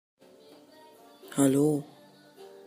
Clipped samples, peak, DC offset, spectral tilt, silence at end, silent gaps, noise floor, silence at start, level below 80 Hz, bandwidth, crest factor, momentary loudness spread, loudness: under 0.1%; -10 dBFS; under 0.1%; -6 dB/octave; 0.2 s; none; -55 dBFS; 1.25 s; -76 dBFS; 15.5 kHz; 20 dB; 26 LU; -27 LUFS